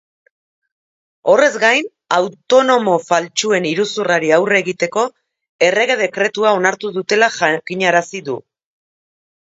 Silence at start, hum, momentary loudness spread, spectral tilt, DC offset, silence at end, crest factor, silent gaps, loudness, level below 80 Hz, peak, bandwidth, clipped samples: 1.25 s; none; 8 LU; -3.5 dB/octave; under 0.1%; 1.2 s; 16 dB; 5.49-5.59 s; -15 LUFS; -68 dBFS; 0 dBFS; 8 kHz; under 0.1%